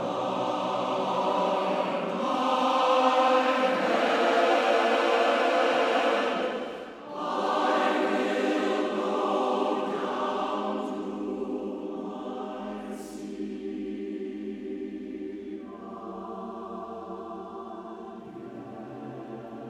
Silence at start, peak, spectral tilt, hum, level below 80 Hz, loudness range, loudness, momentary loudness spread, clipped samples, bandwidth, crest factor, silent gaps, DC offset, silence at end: 0 s; -10 dBFS; -4.5 dB/octave; none; -68 dBFS; 15 LU; -27 LUFS; 17 LU; under 0.1%; 13.5 kHz; 18 dB; none; under 0.1%; 0 s